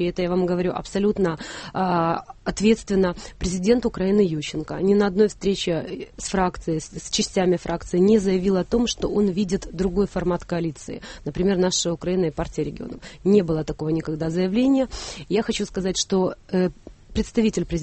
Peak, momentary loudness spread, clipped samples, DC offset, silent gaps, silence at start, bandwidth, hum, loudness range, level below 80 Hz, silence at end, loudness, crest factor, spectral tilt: -6 dBFS; 9 LU; under 0.1%; under 0.1%; none; 0 s; 8.8 kHz; none; 2 LU; -42 dBFS; 0 s; -23 LUFS; 16 dB; -5.5 dB/octave